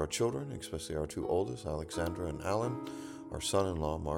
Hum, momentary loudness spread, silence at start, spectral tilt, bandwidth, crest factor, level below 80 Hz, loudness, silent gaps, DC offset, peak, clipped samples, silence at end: none; 9 LU; 0 s; -5 dB/octave; 17 kHz; 18 dB; -50 dBFS; -36 LUFS; none; under 0.1%; -16 dBFS; under 0.1%; 0 s